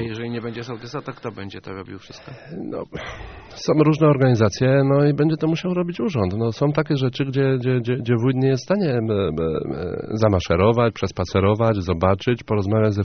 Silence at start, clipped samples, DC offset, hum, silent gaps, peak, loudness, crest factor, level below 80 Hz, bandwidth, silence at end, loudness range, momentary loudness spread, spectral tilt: 0 s; under 0.1%; under 0.1%; none; none; -2 dBFS; -20 LUFS; 18 dB; -46 dBFS; 6.6 kHz; 0 s; 7 LU; 17 LU; -7 dB/octave